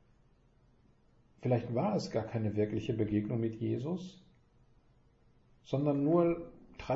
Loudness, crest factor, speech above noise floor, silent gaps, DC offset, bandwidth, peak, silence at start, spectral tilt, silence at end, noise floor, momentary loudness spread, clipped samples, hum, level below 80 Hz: -34 LUFS; 18 dB; 34 dB; none; under 0.1%; 8 kHz; -18 dBFS; 1.45 s; -8.5 dB/octave; 0 s; -66 dBFS; 11 LU; under 0.1%; none; -62 dBFS